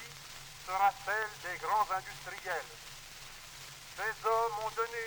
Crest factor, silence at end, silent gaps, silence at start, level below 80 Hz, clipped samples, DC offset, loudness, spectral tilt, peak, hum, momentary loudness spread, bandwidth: 18 dB; 0 s; none; 0 s; -62 dBFS; under 0.1%; under 0.1%; -34 LUFS; -1.5 dB/octave; -18 dBFS; none; 16 LU; over 20 kHz